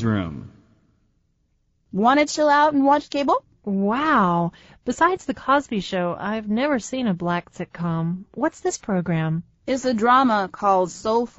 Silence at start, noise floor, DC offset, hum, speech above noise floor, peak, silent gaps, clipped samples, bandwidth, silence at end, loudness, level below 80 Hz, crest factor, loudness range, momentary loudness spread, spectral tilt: 0 s; -67 dBFS; under 0.1%; none; 46 dB; -4 dBFS; none; under 0.1%; 8 kHz; 0.1 s; -21 LUFS; -54 dBFS; 18 dB; 5 LU; 11 LU; -5 dB/octave